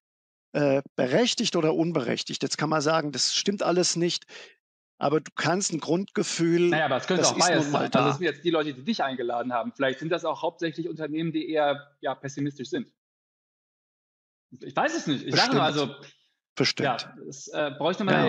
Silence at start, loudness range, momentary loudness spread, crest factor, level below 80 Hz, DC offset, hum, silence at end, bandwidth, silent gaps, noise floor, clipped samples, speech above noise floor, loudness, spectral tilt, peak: 0.55 s; 7 LU; 11 LU; 20 dB; -78 dBFS; under 0.1%; none; 0 s; 9.6 kHz; 0.89-0.95 s, 4.60-4.98 s, 5.32-5.36 s, 12.97-14.49 s, 16.49-16.56 s; under -90 dBFS; under 0.1%; over 64 dB; -26 LUFS; -4 dB/octave; -6 dBFS